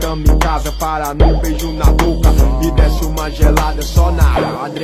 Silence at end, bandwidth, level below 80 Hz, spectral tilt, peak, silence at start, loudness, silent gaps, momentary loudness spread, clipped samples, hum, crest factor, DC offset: 0 s; 15 kHz; -14 dBFS; -6 dB/octave; 0 dBFS; 0 s; -15 LUFS; none; 6 LU; under 0.1%; none; 12 dB; 0.8%